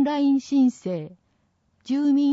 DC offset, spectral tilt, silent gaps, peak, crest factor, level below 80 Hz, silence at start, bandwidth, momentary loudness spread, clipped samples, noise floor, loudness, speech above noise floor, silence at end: under 0.1%; -6.5 dB/octave; none; -12 dBFS; 12 dB; -72 dBFS; 0 s; 7.8 kHz; 12 LU; under 0.1%; -68 dBFS; -23 LUFS; 46 dB; 0 s